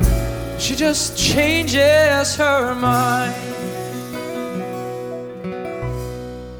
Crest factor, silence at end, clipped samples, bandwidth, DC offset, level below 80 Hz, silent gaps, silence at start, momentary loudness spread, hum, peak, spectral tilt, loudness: 18 dB; 0 s; under 0.1%; over 20 kHz; under 0.1%; -30 dBFS; none; 0 s; 14 LU; none; -2 dBFS; -4 dB/octave; -19 LUFS